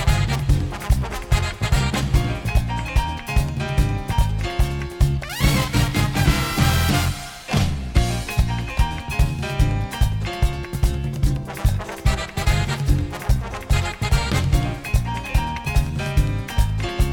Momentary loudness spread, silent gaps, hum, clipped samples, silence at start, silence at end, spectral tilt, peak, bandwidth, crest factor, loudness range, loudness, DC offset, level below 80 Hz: 4 LU; none; none; under 0.1%; 0 s; 0 s; -5 dB/octave; -4 dBFS; 18 kHz; 16 dB; 3 LU; -22 LUFS; under 0.1%; -24 dBFS